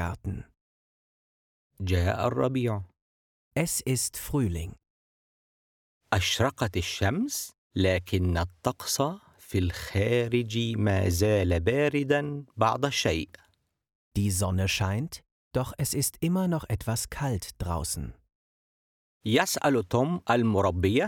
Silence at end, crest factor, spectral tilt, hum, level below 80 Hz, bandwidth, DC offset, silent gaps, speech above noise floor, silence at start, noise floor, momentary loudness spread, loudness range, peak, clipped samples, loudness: 0 s; 20 dB; -5 dB/octave; none; -46 dBFS; 19 kHz; under 0.1%; 0.61-1.70 s, 3.02-3.51 s, 4.90-6.01 s, 7.58-7.70 s, 13.95-14.11 s, 15.32-15.51 s, 18.35-19.20 s; over 63 dB; 0 s; under -90 dBFS; 10 LU; 5 LU; -8 dBFS; under 0.1%; -28 LUFS